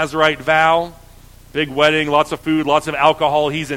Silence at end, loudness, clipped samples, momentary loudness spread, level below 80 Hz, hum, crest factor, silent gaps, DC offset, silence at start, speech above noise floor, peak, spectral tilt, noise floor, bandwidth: 0 s; -16 LUFS; under 0.1%; 8 LU; -46 dBFS; none; 16 dB; none; under 0.1%; 0 s; 26 dB; 0 dBFS; -4.5 dB/octave; -42 dBFS; 16.5 kHz